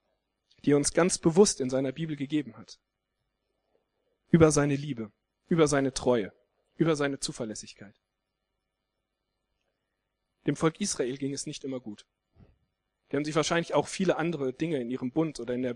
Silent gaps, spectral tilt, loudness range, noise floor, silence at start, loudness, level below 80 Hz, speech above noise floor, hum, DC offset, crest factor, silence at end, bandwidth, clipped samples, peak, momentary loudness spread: none; -5 dB/octave; 8 LU; -83 dBFS; 0.65 s; -28 LUFS; -58 dBFS; 55 dB; none; under 0.1%; 22 dB; 0 s; 12 kHz; under 0.1%; -8 dBFS; 15 LU